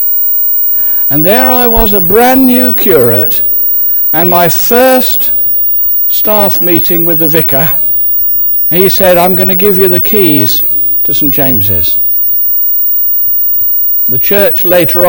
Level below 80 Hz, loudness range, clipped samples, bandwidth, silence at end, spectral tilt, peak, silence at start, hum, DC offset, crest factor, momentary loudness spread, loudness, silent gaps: -30 dBFS; 0 LU; 1%; over 20 kHz; 0 s; -5 dB/octave; 0 dBFS; 0 s; none; 2%; 8 dB; 1 LU; -5 LUFS; none